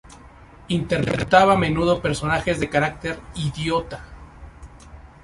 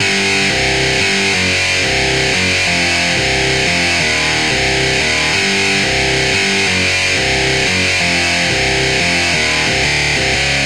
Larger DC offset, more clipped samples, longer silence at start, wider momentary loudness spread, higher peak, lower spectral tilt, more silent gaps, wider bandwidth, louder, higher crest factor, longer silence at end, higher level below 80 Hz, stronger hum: second, under 0.1% vs 0.9%; neither; about the same, 0.05 s vs 0 s; first, 13 LU vs 1 LU; about the same, -2 dBFS vs -2 dBFS; first, -5.5 dB/octave vs -2.5 dB/octave; neither; second, 11.5 kHz vs 16 kHz; second, -21 LUFS vs -12 LUFS; first, 22 dB vs 12 dB; first, 0.15 s vs 0 s; second, -42 dBFS vs -32 dBFS; neither